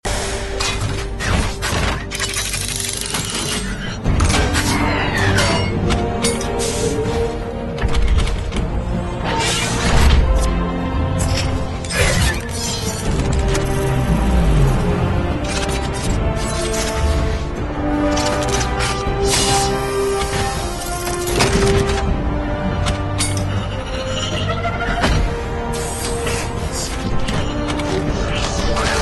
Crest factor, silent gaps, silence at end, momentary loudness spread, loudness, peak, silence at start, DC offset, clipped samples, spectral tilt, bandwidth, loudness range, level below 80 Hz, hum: 16 dB; none; 0 s; 7 LU; -19 LUFS; 0 dBFS; 0.05 s; under 0.1%; under 0.1%; -4.5 dB/octave; 12.5 kHz; 3 LU; -22 dBFS; none